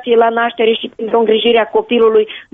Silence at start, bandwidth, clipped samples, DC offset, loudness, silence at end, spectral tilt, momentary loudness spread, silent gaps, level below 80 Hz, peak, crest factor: 0 s; 3.9 kHz; under 0.1%; under 0.1%; -13 LUFS; 0.15 s; -7 dB/octave; 4 LU; none; -56 dBFS; -2 dBFS; 10 dB